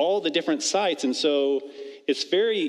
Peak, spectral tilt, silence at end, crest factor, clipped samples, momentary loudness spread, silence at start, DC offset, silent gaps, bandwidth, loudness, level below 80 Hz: -10 dBFS; -2.5 dB/octave; 0 s; 14 dB; under 0.1%; 7 LU; 0 s; under 0.1%; none; 12 kHz; -24 LUFS; -88 dBFS